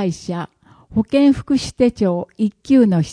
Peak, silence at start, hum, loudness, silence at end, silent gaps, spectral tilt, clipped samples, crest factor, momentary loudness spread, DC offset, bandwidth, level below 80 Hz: -2 dBFS; 0 s; none; -17 LUFS; 0 s; none; -7 dB/octave; under 0.1%; 14 dB; 12 LU; under 0.1%; 10.5 kHz; -46 dBFS